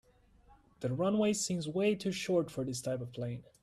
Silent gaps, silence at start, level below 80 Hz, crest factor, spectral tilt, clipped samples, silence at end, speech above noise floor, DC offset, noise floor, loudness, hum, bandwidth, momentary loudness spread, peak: none; 0.5 s; -66 dBFS; 14 dB; -5 dB/octave; under 0.1%; 0.2 s; 30 dB; under 0.1%; -64 dBFS; -34 LUFS; none; 14 kHz; 10 LU; -20 dBFS